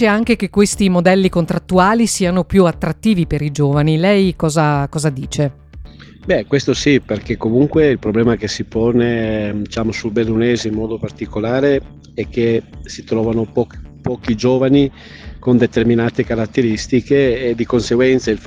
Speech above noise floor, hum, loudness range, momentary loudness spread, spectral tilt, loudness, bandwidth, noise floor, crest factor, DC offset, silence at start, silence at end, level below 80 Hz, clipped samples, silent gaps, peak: 20 dB; none; 4 LU; 9 LU; -6 dB/octave; -16 LUFS; 14 kHz; -35 dBFS; 16 dB; under 0.1%; 0 s; 0 s; -36 dBFS; under 0.1%; none; 0 dBFS